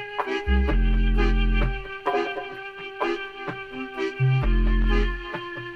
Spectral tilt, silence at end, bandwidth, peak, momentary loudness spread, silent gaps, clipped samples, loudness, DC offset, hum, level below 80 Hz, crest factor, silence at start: -7.5 dB/octave; 0 s; 6.2 kHz; -10 dBFS; 10 LU; none; under 0.1%; -26 LUFS; under 0.1%; none; -24 dBFS; 14 dB; 0 s